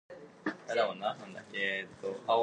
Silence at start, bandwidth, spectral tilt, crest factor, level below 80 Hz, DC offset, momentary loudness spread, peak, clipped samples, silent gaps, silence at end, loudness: 0.1 s; 9.8 kHz; -4 dB/octave; 18 dB; -80 dBFS; under 0.1%; 10 LU; -16 dBFS; under 0.1%; none; 0 s; -35 LUFS